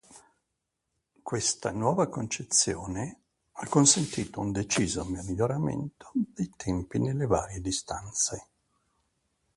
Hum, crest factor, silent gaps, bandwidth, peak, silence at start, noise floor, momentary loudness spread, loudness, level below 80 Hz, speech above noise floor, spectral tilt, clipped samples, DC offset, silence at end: none; 24 dB; none; 11.5 kHz; -8 dBFS; 0.1 s; -82 dBFS; 12 LU; -28 LUFS; -52 dBFS; 54 dB; -4 dB/octave; under 0.1%; under 0.1%; 1.15 s